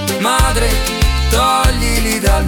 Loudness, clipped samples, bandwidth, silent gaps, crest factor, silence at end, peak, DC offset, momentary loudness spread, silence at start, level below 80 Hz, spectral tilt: -14 LUFS; under 0.1%; 18 kHz; none; 12 dB; 0 s; -2 dBFS; under 0.1%; 3 LU; 0 s; -16 dBFS; -4 dB/octave